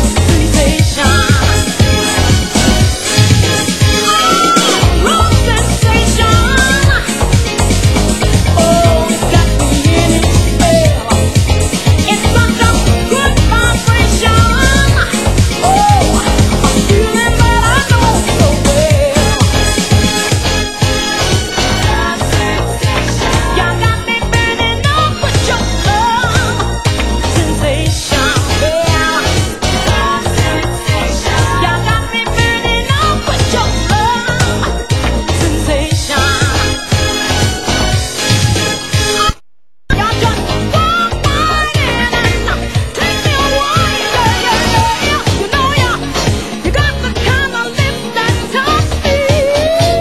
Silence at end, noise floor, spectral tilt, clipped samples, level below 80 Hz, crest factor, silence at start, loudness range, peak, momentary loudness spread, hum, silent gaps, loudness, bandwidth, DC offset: 0 s; -63 dBFS; -4 dB/octave; 0.2%; -18 dBFS; 10 dB; 0 s; 3 LU; 0 dBFS; 5 LU; none; none; -11 LUFS; 16 kHz; 2%